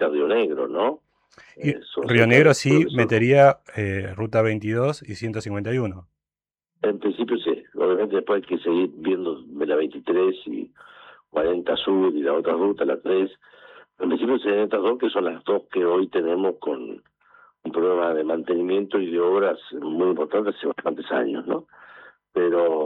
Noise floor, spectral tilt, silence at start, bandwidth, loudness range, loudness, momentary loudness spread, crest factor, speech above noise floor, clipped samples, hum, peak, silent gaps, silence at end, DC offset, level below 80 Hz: under -90 dBFS; -6.5 dB/octave; 0 s; 10.5 kHz; 7 LU; -22 LUFS; 11 LU; 20 dB; over 68 dB; under 0.1%; none; -2 dBFS; none; 0 s; under 0.1%; -64 dBFS